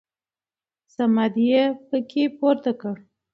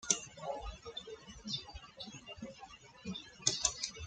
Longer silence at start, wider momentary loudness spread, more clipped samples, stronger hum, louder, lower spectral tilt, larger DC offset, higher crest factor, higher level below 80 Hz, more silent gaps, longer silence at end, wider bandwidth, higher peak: first, 1 s vs 0 s; second, 13 LU vs 17 LU; neither; neither; first, -22 LUFS vs -39 LUFS; first, -7.5 dB/octave vs -1.5 dB/octave; neither; second, 16 dB vs 30 dB; second, -74 dBFS vs -58 dBFS; neither; first, 0.35 s vs 0 s; second, 6.2 kHz vs 11 kHz; first, -6 dBFS vs -12 dBFS